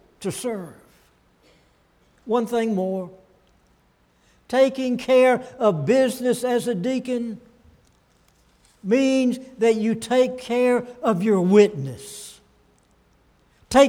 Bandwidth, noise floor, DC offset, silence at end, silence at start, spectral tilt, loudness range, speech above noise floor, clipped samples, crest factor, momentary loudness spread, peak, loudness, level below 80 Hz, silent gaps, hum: 16.5 kHz; -61 dBFS; under 0.1%; 0 s; 0.2 s; -5.5 dB/octave; 8 LU; 41 dB; under 0.1%; 20 dB; 16 LU; -4 dBFS; -21 LUFS; -58 dBFS; none; none